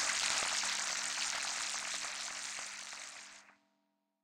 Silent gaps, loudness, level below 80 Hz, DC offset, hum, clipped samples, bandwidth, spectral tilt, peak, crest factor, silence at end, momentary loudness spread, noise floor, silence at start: none; -36 LUFS; -76 dBFS; under 0.1%; none; under 0.1%; 17 kHz; 2.5 dB/octave; -16 dBFS; 22 dB; 0.75 s; 14 LU; -82 dBFS; 0 s